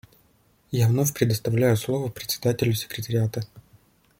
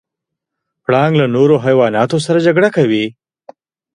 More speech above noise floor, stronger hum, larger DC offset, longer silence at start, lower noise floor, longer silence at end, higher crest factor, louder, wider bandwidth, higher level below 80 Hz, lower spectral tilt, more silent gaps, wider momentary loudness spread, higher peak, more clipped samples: second, 38 dB vs 68 dB; neither; neither; second, 0.7 s vs 0.9 s; second, -62 dBFS vs -80 dBFS; second, 0.6 s vs 0.85 s; first, 20 dB vs 14 dB; second, -24 LUFS vs -13 LUFS; first, 16.5 kHz vs 11 kHz; about the same, -56 dBFS vs -58 dBFS; about the same, -5.5 dB/octave vs -6.5 dB/octave; neither; about the same, 7 LU vs 6 LU; second, -6 dBFS vs 0 dBFS; neither